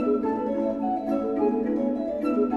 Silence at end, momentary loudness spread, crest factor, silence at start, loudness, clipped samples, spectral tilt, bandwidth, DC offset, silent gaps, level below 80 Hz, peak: 0 s; 2 LU; 14 dB; 0 s; -26 LUFS; under 0.1%; -9 dB/octave; 6.4 kHz; under 0.1%; none; -56 dBFS; -12 dBFS